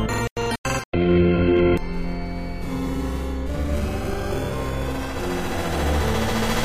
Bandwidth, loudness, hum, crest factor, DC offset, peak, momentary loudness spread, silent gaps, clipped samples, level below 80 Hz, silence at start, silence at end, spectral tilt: 15.5 kHz; -24 LUFS; none; 16 dB; 0.9%; -8 dBFS; 11 LU; 0.31-0.36 s, 0.58-0.64 s, 0.85-0.92 s; under 0.1%; -30 dBFS; 0 s; 0 s; -6 dB/octave